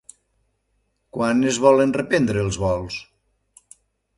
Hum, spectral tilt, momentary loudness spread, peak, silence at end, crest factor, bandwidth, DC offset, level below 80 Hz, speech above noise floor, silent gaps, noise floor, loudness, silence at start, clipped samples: none; -5.5 dB/octave; 16 LU; -2 dBFS; 1.15 s; 20 dB; 11.5 kHz; under 0.1%; -46 dBFS; 51 dB; none; -70 dBFS; -20 LUFS; 1.15 s; under 0.1%